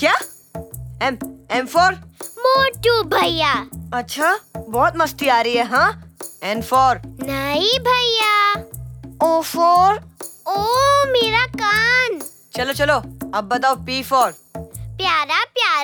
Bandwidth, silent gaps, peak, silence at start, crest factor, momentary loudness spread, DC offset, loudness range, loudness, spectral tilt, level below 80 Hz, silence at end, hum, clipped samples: over 20 kHz; none; -4 dBFS; 0 s; 14 dB; 17 LU; under 0.1%; 3 LU; -17 LUFS; -3 dB/octave; -44 dBFS; 0 s; none; under 0.1%